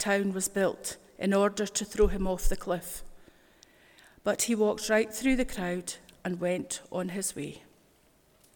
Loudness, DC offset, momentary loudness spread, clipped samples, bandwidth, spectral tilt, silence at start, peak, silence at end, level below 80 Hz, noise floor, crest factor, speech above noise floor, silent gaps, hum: -30 LUFS; under 0.1%; 12 LU; under 0.1%; 19 kHz; -4 dB/octave; 0 s; -12 dBFS; 0.95 s; -40 dBFS; -64 dBFS; 18 dB; 35 dB; none; none